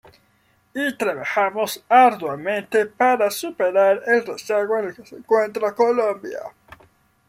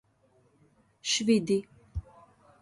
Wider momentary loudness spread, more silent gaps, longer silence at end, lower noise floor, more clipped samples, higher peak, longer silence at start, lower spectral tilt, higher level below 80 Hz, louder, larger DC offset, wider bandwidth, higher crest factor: second, 13 LU vs 17 LU; neither; first, 0.8 s vs 0.6 s; second, -62 dBFS vs -66 dBFS; neither; first, -4 dBFS vs -12 dBFS; second, 0.75 s vs 1.05 s; about the same, -3.5 dB/octave vs -4 dB/octave; second, -68 dBFS vs -50 dBFS; first, -20 LUFS vs -28 LUFS; neither; first, 16 kHz vs 11.5 kHz; about the same, 18 dB vs 20 dB